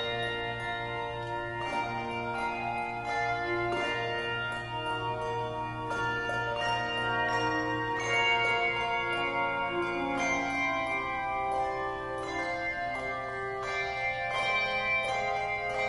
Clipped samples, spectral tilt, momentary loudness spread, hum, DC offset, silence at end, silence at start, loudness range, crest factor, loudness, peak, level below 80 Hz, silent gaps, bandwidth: under 0.1%; -4 dB/octave; 7 LU; 60 Hz at -55 dBFS; under 0.1%; 0 s; 0 s; 4 LU; 16 dB; -31 LUFS; -16 dBFS; -54 dBFS; none; 11.5 kHz